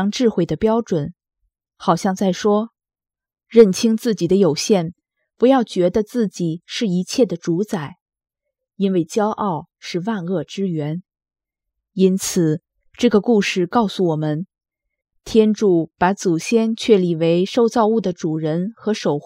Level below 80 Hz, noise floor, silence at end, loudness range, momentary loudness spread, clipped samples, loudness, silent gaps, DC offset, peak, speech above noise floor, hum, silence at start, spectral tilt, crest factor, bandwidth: -54 dBFS; -81 dBFS; 0.05 s; 6 LU; 9 LU; under 0.1%; -19 LUFS; 8.01-8.06 s; under 0.1%; 0 dBFS; 63 dB; none; 0 s; -6 dB/octave; 18 dB; 16 kHz